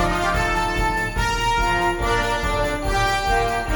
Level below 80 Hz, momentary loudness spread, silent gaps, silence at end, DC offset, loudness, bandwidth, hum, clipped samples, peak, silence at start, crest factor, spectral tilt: -28 dBFS; 3 LU; none; 0 s; under 0.1%; -21 LUFS; 19 kHz; none; under 0.1%; -6 dBFS; 0 s; 14 dB; -4 dB/octave